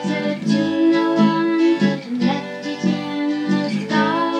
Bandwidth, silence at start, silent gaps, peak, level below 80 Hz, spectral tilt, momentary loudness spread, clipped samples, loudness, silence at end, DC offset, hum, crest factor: 9.2 kHz; 0 s; none; -4 dBFS; -86 dBFS; -6.5 dB/octave; 6 LU; under 0.1%; -19 LUFS; 0 s; under 0.1%; none; 14 dB